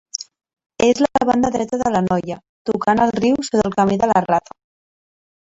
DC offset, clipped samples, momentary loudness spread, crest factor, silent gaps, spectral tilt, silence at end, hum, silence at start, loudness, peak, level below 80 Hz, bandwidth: under 0.1%; under 0.1%; 12 LU; 18 dB; 0.66-0.70 s, 2.49-2.65 s; -5.5 dB/octave; 1.1 s; none; 0.2 s; -18 LUFS; 0 dBFS; -48 dBFS; 8 kHz